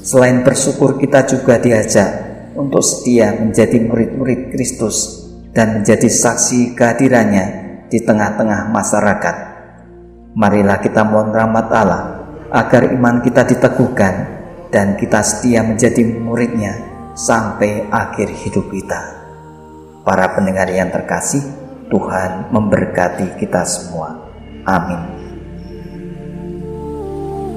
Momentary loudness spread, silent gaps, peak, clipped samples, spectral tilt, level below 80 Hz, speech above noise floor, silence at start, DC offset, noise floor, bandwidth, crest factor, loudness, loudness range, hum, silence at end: 16 LU; none; 0 dBFS; under 0.1%; -5 dB/octave; -40 dBFS; 24 dB; 0 s; 0.1%; -37 dBFS; 15.5 kHz; 14 dB; -14 LUFS; 6 LU; none; 0 s